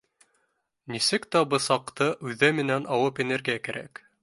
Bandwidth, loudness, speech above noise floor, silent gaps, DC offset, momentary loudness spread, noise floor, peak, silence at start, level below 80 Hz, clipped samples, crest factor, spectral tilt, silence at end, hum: 11.5 kHz; -25 LUFS; 48 dB; none; under 0.1%; 11 LU; -74 dBFS; -4 dBFS; 0.85 s; -70 dBFS; under 0.1%; 22 dB; -4 dB/octave; 0.35 s; none